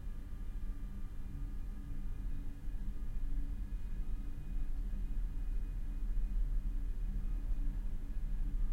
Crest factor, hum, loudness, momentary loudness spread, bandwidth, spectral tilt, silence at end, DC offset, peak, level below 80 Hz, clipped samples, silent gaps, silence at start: 12 dB; none; -45 LUFS; 6 LU; 3.4 kHz; -7.5 dB/octave; 0 s; under 0.1%; -24 dBFS; -38 dBFS; under 0.1%; none; 0 s